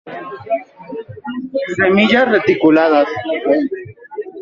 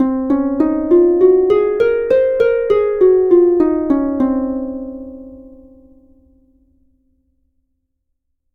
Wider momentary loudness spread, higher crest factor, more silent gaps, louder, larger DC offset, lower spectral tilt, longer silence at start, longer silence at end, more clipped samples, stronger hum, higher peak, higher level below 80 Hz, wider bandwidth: first, 18 LU vs 14 LU; about the same, 14 dB vs 14 dB; neither; about the same, -14 LUFS vs -14 LUFS; neither; second, -6.5 dB/octave vs -8.5 dB/octave; about the same, 0.05 s vs 0 s; second, 0 s vs 3.05 s; neither; neither; about the same, -2 dBFS vs 0 dBFS; second, -56 dBFS vs -44 dBFS; first, 7.4 kHz vs 4.5 kHz